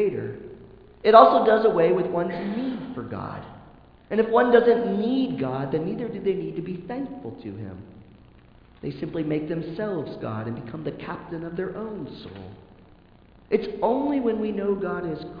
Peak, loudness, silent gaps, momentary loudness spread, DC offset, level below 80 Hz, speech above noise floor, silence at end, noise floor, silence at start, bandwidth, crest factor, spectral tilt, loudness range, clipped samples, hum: 0 dBFS; -24 LUFS; none; 19 LU; under 0.1%; -56 dBFS; 29 dB; 0 s; -53 dBFS; 0 s; 5.2 kHz; 24 dB; -9.5 dB/octave; 12 LU; under 0.1%; none